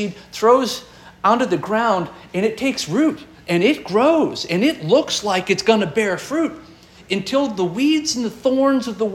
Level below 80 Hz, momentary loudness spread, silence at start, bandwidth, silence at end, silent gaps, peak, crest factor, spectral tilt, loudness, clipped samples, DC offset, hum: -56 dBFS; 7 LU; 0 s; 16.5 kHz; 0 s; none; -2 dBFS; 16 dB; -4.5 dB/octave; -19 LUFS; under 0.1%; under 0.1%; 60 Hz at -50 dBFS